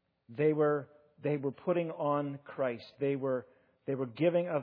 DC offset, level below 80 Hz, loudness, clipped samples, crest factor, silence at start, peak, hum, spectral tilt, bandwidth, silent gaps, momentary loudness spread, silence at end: under 0.1%; -84 dBFS; -33 LUFS; under 0.1%; 16 dB; 0.3 s; -16 dBFS; none; -7 dB/octave; 5.2 kHz; none; 10 LU; 0 s